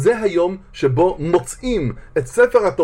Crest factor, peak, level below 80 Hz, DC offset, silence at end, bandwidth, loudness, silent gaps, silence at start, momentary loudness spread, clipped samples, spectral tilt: 16 dB; -2 dBFS; -38 dBFS; under 0.1%; 0 s; 15.5 kHz; -18 LUFS; none; 0 s; 8 LU; under 0.1%; -6 dB/octave